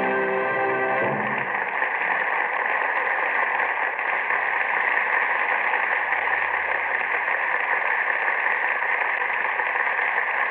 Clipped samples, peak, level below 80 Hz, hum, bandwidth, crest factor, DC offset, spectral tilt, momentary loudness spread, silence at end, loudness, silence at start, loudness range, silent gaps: under 0.1%; -8 dBFS; -70 dBFS; none; 4.6 kHz; 16 dB; under 0.1%; -1 dB/octave; 2 LU; 0 s; -22 LUFS; 0 s; 1 LU; none